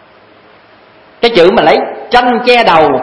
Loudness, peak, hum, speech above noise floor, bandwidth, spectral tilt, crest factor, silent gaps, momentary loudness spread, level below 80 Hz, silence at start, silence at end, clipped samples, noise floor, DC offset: -8 LUFS; 0 dBFS; none; 33 dB; 11 kHz; -5.5 dB/octave; 10 dB; none; 5 LU; -42 dBFS; 1.2 s; 0 s; 1%; -41 dBFS; under 0.1%